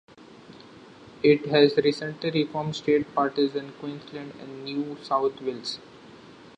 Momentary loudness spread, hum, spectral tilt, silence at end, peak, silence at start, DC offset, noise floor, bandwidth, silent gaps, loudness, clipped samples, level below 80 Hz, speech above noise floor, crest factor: 18 LU; none; -6 dB/octave; 0.1 s; -6 dBFS; 0.2 s; under 0.1%; -48 dBFS; 9.2 kHz; none; -25 LUFS; under 0.1%; -68 dBFS; 23 dB; 22 dB